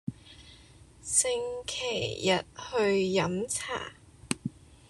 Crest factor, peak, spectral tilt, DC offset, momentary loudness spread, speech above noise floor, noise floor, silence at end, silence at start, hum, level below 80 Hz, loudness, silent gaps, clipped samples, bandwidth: 24 dB; -8 dBFS; -3 dB/octave; under 0.1%; 16 LU; 25 dB; -54 dBFS; 0.15 s; 0.05 s; none; -58 dBFS; -29 LUFS; none; under 0.1%; 12.5 kHz